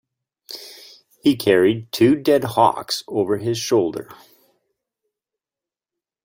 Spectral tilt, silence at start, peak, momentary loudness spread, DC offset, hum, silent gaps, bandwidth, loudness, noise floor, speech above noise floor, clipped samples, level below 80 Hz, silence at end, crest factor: -5 dB/octave; 0.5 s; -2 dBFS; 19 LU; under 0.1%; none; none; 16.5 kHz; -19 LUFS; -90 dBFS; 72 dB; under 0.1%; -60 dBFS; 2.1 s; 20 dB